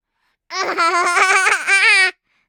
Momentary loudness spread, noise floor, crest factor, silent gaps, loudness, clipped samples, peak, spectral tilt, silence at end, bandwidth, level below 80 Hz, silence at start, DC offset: 11 LU; -69 dBFS; 16 dB; none; -13 LUFS; under 0.1%; -2 dBFS; 1.5 dB/octave; 0.35 s; 17.5 kHz; -78 dBFS; 0.5 s; under 0.1%